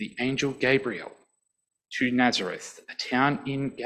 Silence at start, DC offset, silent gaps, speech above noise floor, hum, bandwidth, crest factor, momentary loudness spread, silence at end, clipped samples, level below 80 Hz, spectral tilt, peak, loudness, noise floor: 0 s; under 0.1%; none; 52 dB; none; 11 kHz; 20 dB; 14 LU; 0 s; under 0.1%; -62 dBFS; -4.5 dB/octave; -8 dBFS; -26 LUFS; -79 dBFS